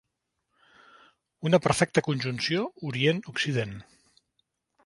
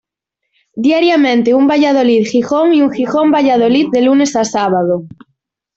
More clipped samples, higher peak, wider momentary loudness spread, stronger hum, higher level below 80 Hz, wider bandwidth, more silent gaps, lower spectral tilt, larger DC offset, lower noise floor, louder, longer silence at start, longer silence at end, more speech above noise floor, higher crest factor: neither; second, -6 dBFS vs -2 dBFS; first, 10 LU vs 4 LU; neither; about the same, -60 dBFS vs -56 dBFS; first, 11.5 kHz vs 8 kHz; neither; about the same, -5 dB/octave vs -5 dB/octave; neither; first, -81 dBFS vs -75 dBFS; second, -27 LUFS vs -12 LUFS; first, 1.4 s vs 0.75 s; first, 1.05 s vs 0.7 s; second, 54 dB vs 64 dB; first, 24 dB vs 10 dB